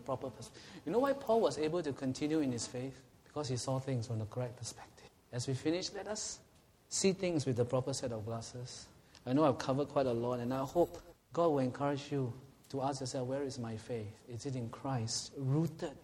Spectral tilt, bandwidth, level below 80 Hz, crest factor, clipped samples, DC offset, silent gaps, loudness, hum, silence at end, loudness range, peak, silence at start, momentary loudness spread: -5.5 dB/octave; 16 kHz; -66 dBFS; 20 dB; under 0.1%; under 0.1%; none; -37 LUFS; none; 0 s; 5 LU; -16 dBFS; 0 s; 14 LU